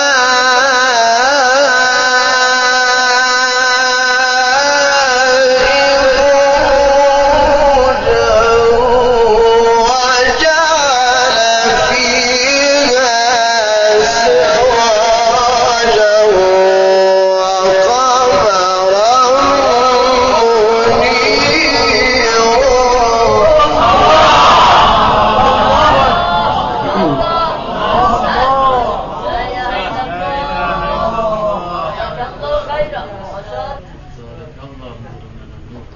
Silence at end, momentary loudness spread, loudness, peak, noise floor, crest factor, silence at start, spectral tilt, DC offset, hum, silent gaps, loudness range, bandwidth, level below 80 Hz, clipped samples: 0.1 s; 9 LU; -10 LUFS; 0 dBFS; -32 dBFS; 10 dB; 0 s; -0.5 dB/octave; under 0.1%; none; none; 10 LU; 7.4 kHz; -30 dBFS; under 0.1%